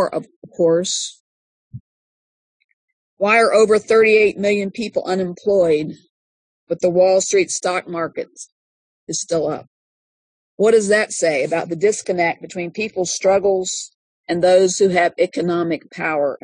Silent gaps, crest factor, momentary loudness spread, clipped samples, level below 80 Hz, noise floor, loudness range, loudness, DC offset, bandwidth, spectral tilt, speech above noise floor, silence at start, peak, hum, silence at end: 0.36-0.42 s, 1.20-1.71 s, 1.80-3.17 s, 6.10-6.67 s, 8.52-9.07 s, 9.67-10.58 s, 13.94-14.24 s; 16 dB; 13 LU; under 0.1%; -62 dBFS; under -90 dBFS; 5 LU; -17 LUFS; under 0.1%; 10.5 kHz; -3.5 dB/octave; over 73 dB; 0 s; -2 dBFS; none; 0.1 s